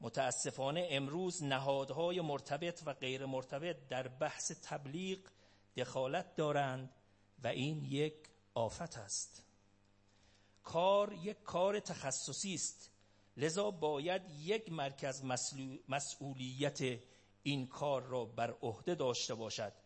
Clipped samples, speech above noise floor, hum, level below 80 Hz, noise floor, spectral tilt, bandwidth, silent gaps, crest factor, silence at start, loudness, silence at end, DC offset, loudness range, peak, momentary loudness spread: under 0.1%; 31 dB; none; -76 dBFS; -70 dBFS; -4 dB/octave; 8.8 kHz; none; 20 dB; 0 s; -40 LUFS; 0.1 s; under 0.1%; 4 LU; -20 dBFS; 8 LU